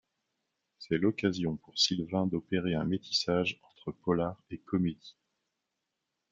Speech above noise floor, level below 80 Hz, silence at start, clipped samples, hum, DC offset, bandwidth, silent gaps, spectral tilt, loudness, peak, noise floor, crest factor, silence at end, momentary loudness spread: 54 dB; -64 dBFS; 0.8 s; under 0.1%; none; under 0.1%; 7.8 kHz; none; -5 dB/octave; -31 LUFS; -14 dBFS; -85 dBFS; 20 dB; 1.2 s; 12 LU